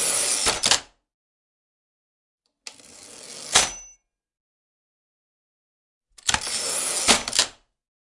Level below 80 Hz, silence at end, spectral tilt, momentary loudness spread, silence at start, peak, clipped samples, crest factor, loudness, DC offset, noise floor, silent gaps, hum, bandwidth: -52 dBFS; 0.55 s; 0.5 dB/octave; 22 LU; 0 s; 0 dBFS; under 0.1%; 26 dB; -21 LUFS; under 0.1%; -56 dBFS; 1.14-2.38 s, 4.40-6.01 s; none; 12 kHz